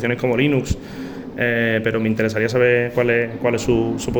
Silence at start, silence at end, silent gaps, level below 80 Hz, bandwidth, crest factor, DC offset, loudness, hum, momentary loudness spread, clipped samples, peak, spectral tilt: 0 s; 0 s; none; -40 dBFS; over 20 kHz; 14 dB; under 0.1%; -19 LUFS; none; 10 LU; under 0.1%; -4 dBFS; -6 dB/octave